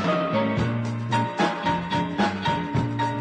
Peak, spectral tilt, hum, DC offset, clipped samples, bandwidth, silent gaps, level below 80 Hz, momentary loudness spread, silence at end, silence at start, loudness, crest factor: -10 dBFS; -6.5 dB/octave; none; under 0.1%; under 0.1%; 9.8 kHz; none; -48 dBFS; 3 LU; 0 s; 0 s; -25 LUFS; 14 dB